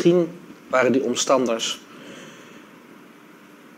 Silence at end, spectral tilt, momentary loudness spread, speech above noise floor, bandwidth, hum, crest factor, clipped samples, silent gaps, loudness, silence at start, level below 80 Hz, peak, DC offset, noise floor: 0.85 s; -4 dB/octave; 23 LU; 28 dB; 15.5 kHz; none; 20 dB; under 0.1%; none; -21 LUFS; 0 s; -72 dBFS; -4 dBFS; under 0.1%; -47 dBFS